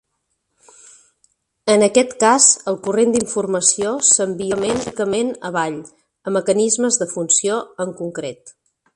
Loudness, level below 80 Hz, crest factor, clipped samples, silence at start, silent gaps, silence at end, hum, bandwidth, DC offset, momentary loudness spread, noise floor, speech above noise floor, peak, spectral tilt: -17 LUFS; -58 dBFS; 20 dB; under 0.1%; 1.65 s; none; 0.45 s; none; 11.5 kHz; under 0.1%; 14 LU; -72 dBFS; 54 dB; 0 dBFS; -2.5 dB/octave